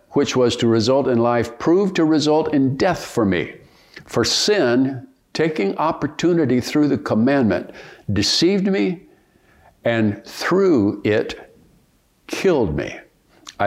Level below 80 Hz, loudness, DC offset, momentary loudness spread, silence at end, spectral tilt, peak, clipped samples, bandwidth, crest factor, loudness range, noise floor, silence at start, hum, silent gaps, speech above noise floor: -50 dBFS; -18 LUFS; under 0.1%; 10 LU; 0 s; -5 dB/octave; -4 dBFS; under 0.1%; 15.5 kHz; 16 dB; 3 LU; -59 dBFS; 0.1 s; none; none; 41 dB